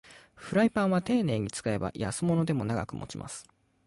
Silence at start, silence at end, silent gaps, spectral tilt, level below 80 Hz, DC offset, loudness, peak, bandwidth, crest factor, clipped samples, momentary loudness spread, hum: 0.1 s; 0.45 s; none; -6 dB/octave; -56 dBFS; under 0.1%; -29 LUFS; -14 dBFS; 11.5 kHz; 16 dB; under 0.1%; 14 LU; none